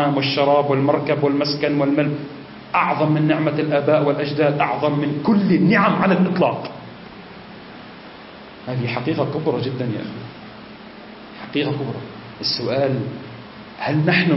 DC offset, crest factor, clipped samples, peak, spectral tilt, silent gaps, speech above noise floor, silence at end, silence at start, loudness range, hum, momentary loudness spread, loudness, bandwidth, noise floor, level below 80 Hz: under 0.1%; 16 dB; under 0.1%; -4 dBFS; -9.5 dB/octave; none; 20 dB; 0 s; 0 s; 8 LU; none; 22 LU; -19 LUFS; 6 kHz; -39 dBFS; -58 dBFS